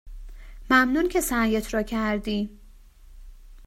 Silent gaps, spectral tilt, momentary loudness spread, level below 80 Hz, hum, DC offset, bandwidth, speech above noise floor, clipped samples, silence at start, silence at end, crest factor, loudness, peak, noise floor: none; -4 dB/octave; 10 LU; -42 dBFS; none; under 0.1%; 16 kHz; 25 dB; under 0.1%; 0.05 s; 0 s; 20 dB; -24 LUFS; -6 dBFS; -49 dBFS